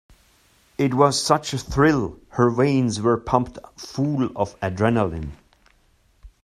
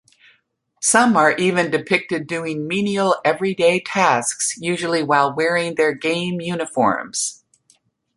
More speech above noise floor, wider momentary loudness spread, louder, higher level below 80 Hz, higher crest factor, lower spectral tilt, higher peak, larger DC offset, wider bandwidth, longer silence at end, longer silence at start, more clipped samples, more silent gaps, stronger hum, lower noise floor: second, 39 dB vs 46 dB; first, 14 LU vs 9 LU; about the same, -21 LUFS vs -19 LUFS; first, -44 dBFS vs -64 dBFS; about the same, 22 dB vs 18 dB; first, -5.5 dB/octave vs -3.5 dB/octave; about the same, -2 dBFS vs -2 dBFS; neither; first, 14 kHz vs 11.5 kHz; second, 0.15 s vs 0.85 s; about the same, 0.8 s vs 0.8 s; neither; neither; neither; second, -60 dBFS vs -64 dBFS